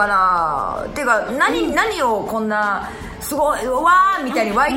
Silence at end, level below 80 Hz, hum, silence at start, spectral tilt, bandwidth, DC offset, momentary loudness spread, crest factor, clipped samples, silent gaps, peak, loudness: 0 s; -42 dBFS; none; 0 s; -3.5 dB/octave; 19.5 kHz; under 0.1%; 9 LU; 16 dB; under 0.1%; none; -2 dBFS; -17 LUFS